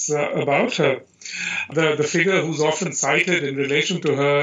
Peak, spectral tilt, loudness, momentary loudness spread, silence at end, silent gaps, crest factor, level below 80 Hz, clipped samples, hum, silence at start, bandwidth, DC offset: -4 dBFS; -3.5 dB/octave; -20 LUFS; 6 LU; 0 s; none; 16 dB; -70 dBFS; under 0.1%; none; 0 s; 8.2 kHz; under 0.1%